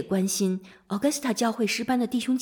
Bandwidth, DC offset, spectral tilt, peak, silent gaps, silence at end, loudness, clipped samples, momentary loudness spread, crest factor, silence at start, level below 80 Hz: 19 kHz; under 0.1%; -4.5 dB/octave; -10 dBFS; none; 0 s; -26 LUFS; under 0.1%; 4 LU; 16 dB; 0 s; -66 dBFS